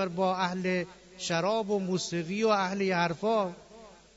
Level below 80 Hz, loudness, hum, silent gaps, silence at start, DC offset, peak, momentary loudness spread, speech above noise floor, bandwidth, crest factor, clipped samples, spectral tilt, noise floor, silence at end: -66 dBFS; -29 LUFS; none; none; 0 s; under 0.1%; -14 dBFS; 8 LU; 23 dB; 8 kHz; 16 dB; under 0.1%; -5 dB/octave; -52 dBFS; 0.25 s